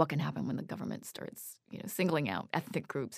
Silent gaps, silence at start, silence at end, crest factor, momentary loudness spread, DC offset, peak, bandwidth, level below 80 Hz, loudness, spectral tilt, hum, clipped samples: none; 0 s; 0 s; 24 dB; 13 LU; under 0.1%; -12 dBFS; 15.5 kHz; -74 dBFS; -36 LUFS; -5.5 dB/octave; none; under 0.1%